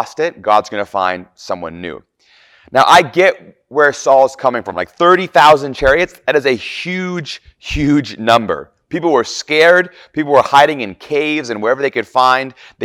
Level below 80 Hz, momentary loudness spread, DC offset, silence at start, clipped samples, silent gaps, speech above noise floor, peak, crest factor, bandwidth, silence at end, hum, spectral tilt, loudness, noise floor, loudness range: -40 dBFS; 15 LU; under 0.1%; 0 s; 0.2%; none; 36 dB; 0 dBFS; 14 dB; 17.5 kHz; 0 s; none; -4.5 dB/octave; -13 LUFS; -50 dBFS; 4 LU